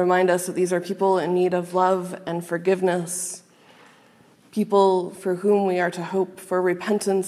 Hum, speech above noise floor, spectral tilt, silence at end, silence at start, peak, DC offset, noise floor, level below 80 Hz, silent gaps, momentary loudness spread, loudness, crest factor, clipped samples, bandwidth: none; 33 dB; -5.5 dB/octave; 0 s; 0 s; -6 dBFS; under 0.1%; -54 dBFS; -78 dBFS; none; 9 LU; -23 LUFS; 18 dB; under 0.1%; 14 kHz